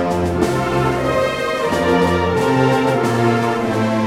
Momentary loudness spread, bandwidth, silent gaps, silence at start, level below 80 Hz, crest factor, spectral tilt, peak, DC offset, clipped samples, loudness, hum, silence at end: 3 LU; 16.5 kHz; none; 0 s; -38 dBFS; 14 dB; -6 dB/octave; -2 dBFS; under 0.1%; under 0.1%; -17 LUFS; none; 0 s